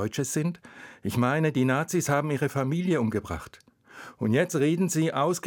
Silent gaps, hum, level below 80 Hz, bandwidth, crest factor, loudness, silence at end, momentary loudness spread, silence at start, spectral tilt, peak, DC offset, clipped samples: none; none; -60 dBFS; 19.5 kHz; 16 dB; -26 LUFS; 0 s; 13 LU; 0 s; -5.5 dB/octave; -10 dBFS; under 0.1%; under 0.1%